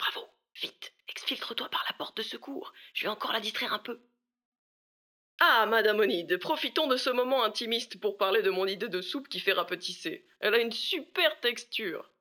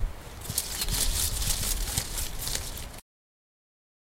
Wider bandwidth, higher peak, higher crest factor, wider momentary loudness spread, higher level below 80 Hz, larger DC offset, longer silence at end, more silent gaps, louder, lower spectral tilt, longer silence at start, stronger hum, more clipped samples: first, over 20 kHz vs 17 kHz; about the same, -8 dBFS vs -8 dBFS; about the same, 22 dB vs 22 dB; about the same, 13 LU vs 14 LU; second, -90 dBFS vs -36 dBFS; neither; second, 0.2 s vs 1 s; first, 4.45-4.52 s, 4.59-5.38 s vs none; about the same, -29 LUFS vs -29 LUFS; about the same, -2.5 dB/octave vs -1.5 dB/octave; about the same, 0 s vs 0 s; neither; neither